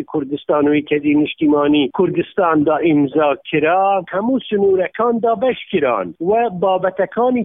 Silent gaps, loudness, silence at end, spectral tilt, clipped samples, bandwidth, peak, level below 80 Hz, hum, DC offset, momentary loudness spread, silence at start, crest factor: none; -16 LUFS; 0 s; -10.5 dB/octave; under 0.1%; 3.8 kHz; -4 dBFS; -54 dBFS; none; under 0.1%; 4 LU; 0 s; 12 dB